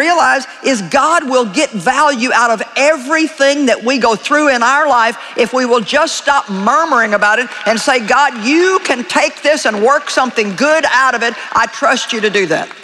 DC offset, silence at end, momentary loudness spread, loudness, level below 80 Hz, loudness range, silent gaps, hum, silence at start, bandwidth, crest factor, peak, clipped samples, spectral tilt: under 0.1%; 0 s; 4 LU; -12 LUFS; -56 dBFS; 1 LU; none; none; 0 s; 13 kHz; 12 dB; 0 dBFS; under 0.1%; -2.5 dB/octave